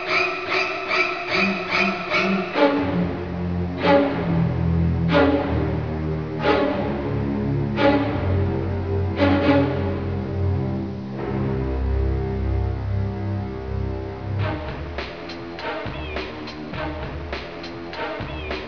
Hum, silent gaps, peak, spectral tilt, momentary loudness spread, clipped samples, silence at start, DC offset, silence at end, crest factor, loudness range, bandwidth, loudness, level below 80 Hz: none; none; -4 dBFS; -7.5 dB/octave; 11 LU; under 0.1%; 0 s; 0.4%; 0 s; 18 dB; 9 LU; 5.4 kHz; -23 LUFS; -34 dBFS